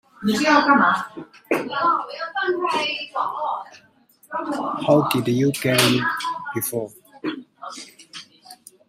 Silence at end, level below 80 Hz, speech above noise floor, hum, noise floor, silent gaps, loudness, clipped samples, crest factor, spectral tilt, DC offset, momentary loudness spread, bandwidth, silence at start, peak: 0.35 s; -64 dBFS; 25 dB; none; -47 dBFS; none; -21 LUFS; under 0.1%; 20 dB; -4.5 dB/octave; under 0.1%; 19 LU; 16 kHz; 0.2 s; -2 dBFS